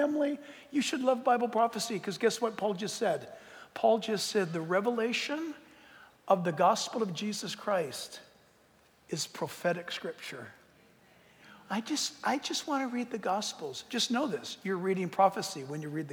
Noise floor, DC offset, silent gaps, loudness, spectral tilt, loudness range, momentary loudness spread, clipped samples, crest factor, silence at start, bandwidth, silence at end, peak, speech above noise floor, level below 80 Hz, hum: -64 dBFS; under 0.1%; none; -32 LUFS; -4 dB/octave; 6 LU; 13 LU; under 0.1%; 20 dB; 0 s; over 20 kHz; 0 s; -12 dBFS; 32 dB; -80 dBFS; none